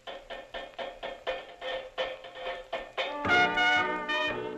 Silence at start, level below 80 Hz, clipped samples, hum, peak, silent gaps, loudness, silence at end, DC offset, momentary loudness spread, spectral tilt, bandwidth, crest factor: 0.05 s; -60 dBFS; under 0.1%; none; -12 dBFS; none; -30 LUFS; 0 s; under 0.1%; 16 LU; -3.5 dB/octave; 13 kHz; 20 dB